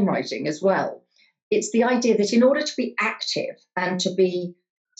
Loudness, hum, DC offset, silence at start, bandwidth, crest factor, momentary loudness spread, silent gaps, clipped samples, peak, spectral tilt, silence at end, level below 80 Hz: -22 LUFS; none; under 0.1%; 0 s; 8.8 kHz; 14 dB; 9 LU; 1.42-1.51 s; under 0.1%; -8 dBFS; -4.5 dB/octave; 0.45 s; -76 dBFS